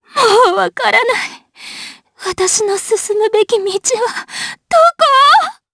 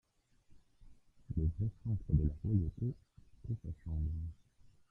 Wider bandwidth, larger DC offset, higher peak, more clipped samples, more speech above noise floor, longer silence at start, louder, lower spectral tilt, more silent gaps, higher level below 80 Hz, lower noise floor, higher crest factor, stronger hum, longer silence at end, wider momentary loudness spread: first, 11 kHz vs 1.9 kHz; neither; first, 0 dBFS vs -18 dBFS; neither; second, 19 dB vs 30 dB; second, 0.15 s vs 0.5 s; first, -12 LUFS vs -38 LUFS; second, -0.5 dB/octave vs -12 dB/octave; neither; second, -56 dBFS vs -46 dBFS; second, -33 dBFS vs -66 dBFS; second, 14 dB vs 22 dB; neither; about the same, 0.2 s vs 0.2 s; first, 18 LU vs 10 LU